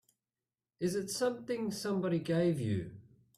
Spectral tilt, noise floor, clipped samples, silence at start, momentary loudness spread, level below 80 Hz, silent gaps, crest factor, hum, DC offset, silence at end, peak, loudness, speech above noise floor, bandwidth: -6 dB/octave; under -90 dBFS; under 0.1%; 0.8 s; 7 LU; -70 dBFS; none; 14 dB; none; under 0.1%; 0.35 s; -20 dBFS; -35 LUFS; over 56 dB; 15.5 kHz